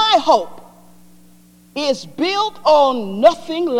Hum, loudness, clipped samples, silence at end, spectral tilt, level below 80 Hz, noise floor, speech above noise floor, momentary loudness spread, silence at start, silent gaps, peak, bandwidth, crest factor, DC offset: 60 Hz at -50 dBFS; -16 LUFS; under 0.1%; 0 s; -3.5 dB/octave; -58 dBFS; -48 dBFS; 32 dB; 9 LU; 0 s; none; -2 dBFS; 15.5 kHz; 16 dB; under 0.1%